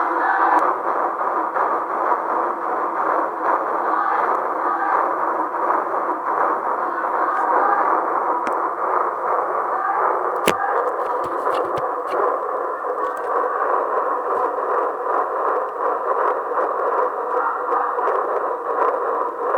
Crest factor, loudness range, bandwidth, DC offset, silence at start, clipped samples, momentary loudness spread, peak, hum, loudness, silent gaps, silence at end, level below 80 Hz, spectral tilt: 20 dB; 2 LU; 19.5 kHz; under 0.1%; 0 s; under 0.1%; 4 LU; 0 dBFS; none; -21 LUFS; none; 0 s; -68 dBFS; -4 dB/octave